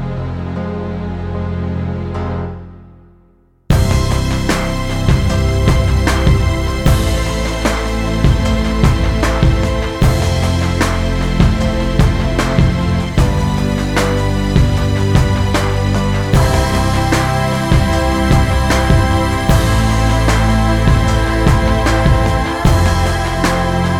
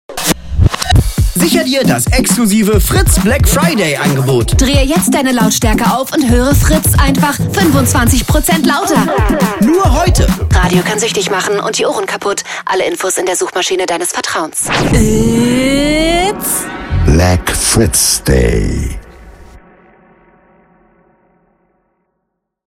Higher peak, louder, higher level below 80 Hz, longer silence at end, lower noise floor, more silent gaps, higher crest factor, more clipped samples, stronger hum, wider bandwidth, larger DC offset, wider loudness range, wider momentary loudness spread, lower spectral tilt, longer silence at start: about the same, 0 dBFS vs 0 dBFS; second, -15 LUFS vs -11 LUFS; about the same, -18 dBFS vs -20 dBFS; second, 0 s vs 3.1 s; second, -50 dBFS vs -70 dBFS; neither; about the same, 12 dB vs 12 dB; neither; neither; about the same, 16 kHz vs 17 kHz; neither; about the same, 5 LU vs 4 LU; about the same, 7 LU vs 5 LU; first, -6 dB/octave vs -4.5 dB/octave; about the same, 0 s vs 0.1 s